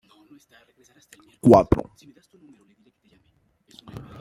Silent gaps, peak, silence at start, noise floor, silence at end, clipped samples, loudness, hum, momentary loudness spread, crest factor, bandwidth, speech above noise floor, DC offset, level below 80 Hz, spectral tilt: none; -2 dBFS; 1.45 s; -65 dBFS; 0.2 s; under 0.1%; -18 LUFS; none; 27 LU; 24 dB; 15.5 kHz; 44 dB; under 0.1%; -46 dBFS; -8.5 dB/octave